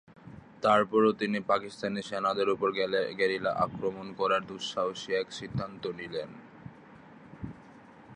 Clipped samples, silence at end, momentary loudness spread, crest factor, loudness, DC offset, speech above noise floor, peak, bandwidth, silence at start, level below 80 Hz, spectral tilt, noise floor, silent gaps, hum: under 0.1%; 0 s; 22 LU; 20 dB; -30 LUFS; under 0.1%; 23 dB; -12 dBFS; 10 kHz; 0.1 s; -64 dBFS; -5.5 dB/octave; -53 dBFS; none; none